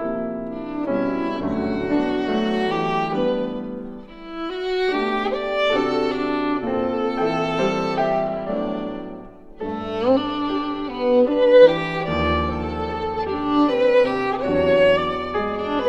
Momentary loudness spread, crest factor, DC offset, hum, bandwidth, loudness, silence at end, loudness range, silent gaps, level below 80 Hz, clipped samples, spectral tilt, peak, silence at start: 12 LU; 20 dB; under 0.1%; none; 7.8 kHz; -21 LUFS; 0 s; 5 LU; none; -42 dBFS; under 0.1%; -6.5 dB/octave; -2 dBFS; 0 s